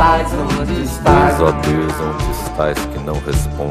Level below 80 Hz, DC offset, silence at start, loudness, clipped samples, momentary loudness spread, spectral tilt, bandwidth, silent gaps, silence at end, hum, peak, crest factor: -24 dBFS; under 0.1%; 0 s; -16 LUFS; under 0.1%; 9 LU; -6 dB/octave; 15.5 kHz; none; 0 s; none; 0 dBFS; 16 dB